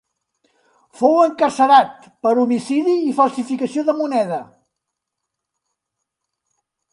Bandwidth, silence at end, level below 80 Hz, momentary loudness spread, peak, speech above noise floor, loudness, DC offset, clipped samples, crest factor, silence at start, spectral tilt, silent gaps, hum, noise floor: 11 kHz; 2.5 s; -72 dBFS; 10 LU; 0 dBFS; 63 dB; -17 LUFS; under 0.1%; under 0.1%; 18 dB; 1 s; -5 dB/octave; none; none; -80 dBFS